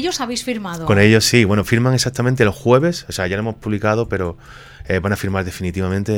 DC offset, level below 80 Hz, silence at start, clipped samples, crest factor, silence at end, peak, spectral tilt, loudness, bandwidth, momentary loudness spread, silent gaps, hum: under 0.1%; -40 dBFS; 0 s; under 0.1%; 18 dB; 0 s; 0 dBFS; -5 dB/octave; -17 LUFS; 17.5 kHz; 11 LU; none; none